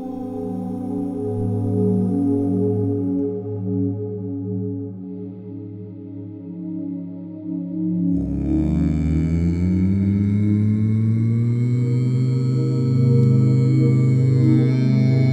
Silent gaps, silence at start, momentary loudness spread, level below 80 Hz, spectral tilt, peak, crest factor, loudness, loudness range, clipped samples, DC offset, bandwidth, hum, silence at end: none; 0 s; 16 LU; -38 dBFS; -10.5 dB/octave; -6 dBFS; 14 dB; -20 LUFS; 11 LU; under 0.1%; under 0.1%; 7.8 kHz; none; 0 s